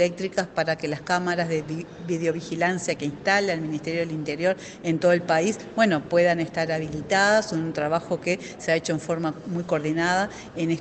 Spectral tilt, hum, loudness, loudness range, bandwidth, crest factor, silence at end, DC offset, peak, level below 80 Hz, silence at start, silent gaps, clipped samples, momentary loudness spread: -5 dB/octave; none; -25 LUFS; 3 LU; 9.2 kHz; 18 dB; 0 s; under 0.1%; -6 dBFS; -58 dBFS; 0 s; none; under 0.1%; 8 LU